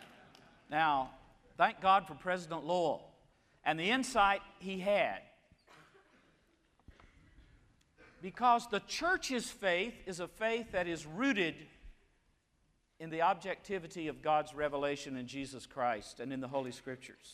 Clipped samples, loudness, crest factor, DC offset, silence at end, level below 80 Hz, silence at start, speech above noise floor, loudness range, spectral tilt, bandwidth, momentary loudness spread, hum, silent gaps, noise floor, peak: under 0.1%; -35 LUFS; 22 dB; under 0.1%; 0 s; -64 dBFS; 0 s; 40 dB; 4 LU; -4 dB/octave; 15 kHz; 14 LU; none; none; -75 dBFS; -14 dBFS